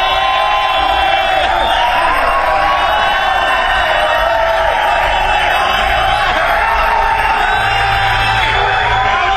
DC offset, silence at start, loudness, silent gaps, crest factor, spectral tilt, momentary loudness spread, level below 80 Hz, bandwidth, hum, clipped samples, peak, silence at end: under 0.1%; 0 s; -12 LUFS; none; 12 dB; -3 dB/octave; 1 LU; -26 dBFS; 13 kHz; none; under 0.1%; 0 dBFS; 0 s